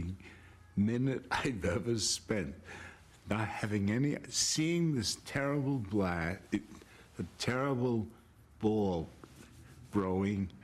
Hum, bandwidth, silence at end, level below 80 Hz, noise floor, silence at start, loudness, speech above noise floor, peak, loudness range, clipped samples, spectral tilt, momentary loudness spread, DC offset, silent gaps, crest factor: none; 14.5 kHz; 0.05 s; -60 dBFS; -55 dBFS; 0 s; -34 LUFS; 22 dB; -18 dBFS; 3 LU; under 0.1%; -4.5 dB/octave; 17 LU; under 0.1%; none; 18 dB